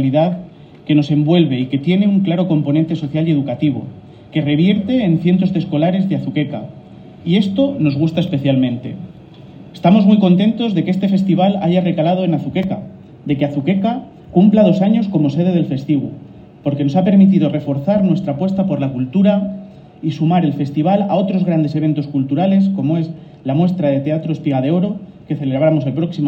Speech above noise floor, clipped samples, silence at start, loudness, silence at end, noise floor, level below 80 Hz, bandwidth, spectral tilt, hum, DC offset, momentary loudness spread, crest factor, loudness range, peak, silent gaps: 23 dB; under 0.1%; 0 s; -16 LUFS; 0 s; -37 dBFS; -54 dBFS; 6 kHz; -9.5 dB/octave; none; under 0.1%; 12 LU; 14 dB; 3 LU; 0 dBFS; none